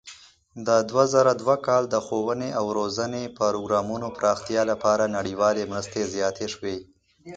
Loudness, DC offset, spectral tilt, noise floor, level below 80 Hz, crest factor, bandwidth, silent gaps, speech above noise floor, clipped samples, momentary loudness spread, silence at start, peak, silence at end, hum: -24 LUFS; under 0.1%; -4.5 dB/octave; -48 dBFS; -58 dBFS; 20 dB; 9 kHz; none; 24 dB; under 0.1%; 10 LU; 0.05 s; -6 dBFS; 0 s; none